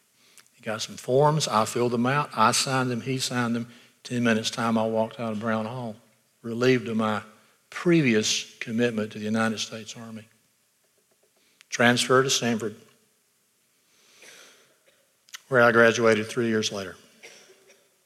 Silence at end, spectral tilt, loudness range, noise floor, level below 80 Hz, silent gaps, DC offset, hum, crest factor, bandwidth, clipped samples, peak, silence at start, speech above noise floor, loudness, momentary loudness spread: 0.75 s; -4 dB/octave; 4 LU; -68 dBFS; -76 dBFS; none; under 0.1%; none; 22 dB; 15 kHz; under 0.1%; -4 dBFS; 0.65 s; 44 dB; -24 LUFS; 18 LU